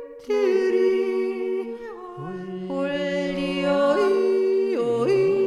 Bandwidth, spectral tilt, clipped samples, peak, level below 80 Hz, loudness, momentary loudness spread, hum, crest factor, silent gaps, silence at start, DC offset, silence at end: 10.5 kHz; -6.5 dB/octave; under 0.1%; -10 dBFS; -58 dBFS; -23 LUFS; 14 LU; none; 14 dB; none; 0 s; under 0.1%; 0 s